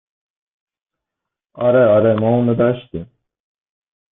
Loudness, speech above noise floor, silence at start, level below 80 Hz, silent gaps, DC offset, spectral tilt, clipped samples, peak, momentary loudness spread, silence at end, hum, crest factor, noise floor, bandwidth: -15 LUFS; 69 dB; 1.55 s; -54 dBFS; none; under 0.1%; -13 dB/octave; under 0.1%; -4 dBFS; 16 LU; 1.05 s; none; 16 dB; -83 dBFS; 3.9 kHz